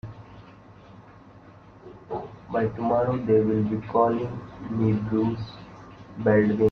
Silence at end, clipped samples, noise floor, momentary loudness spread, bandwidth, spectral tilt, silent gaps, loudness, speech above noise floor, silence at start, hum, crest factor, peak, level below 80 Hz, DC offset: 0 s; under 0.1%; -49 dBFS; 21 LU; 6.4 kHz; -10 dB/octave; none; -25 LUFS; 25 dB; 0.05 s; none; 18 dB; -8 dBFS; -54 dBFS; under 0.1%